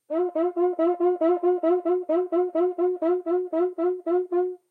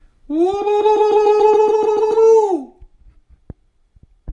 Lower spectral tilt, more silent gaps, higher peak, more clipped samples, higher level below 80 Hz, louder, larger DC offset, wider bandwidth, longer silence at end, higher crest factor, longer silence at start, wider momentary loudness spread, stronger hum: first, -7 dB/octave vs -5.5 dB/octave; neither; second, -12 dBFS vs -4 dBFS; neither; second, under -90 dBFS vs -48 dBFS; second, -24 LUFS vs -14 LUFS; neither; second, 3.8 kHz vs 7.8 kHz; first, 0.15 s vs 0 s; about the same, 10 dB vs 12 dB; second, 0.1 s vs 0.3 s; second, 4 LU vs 8 LU; neither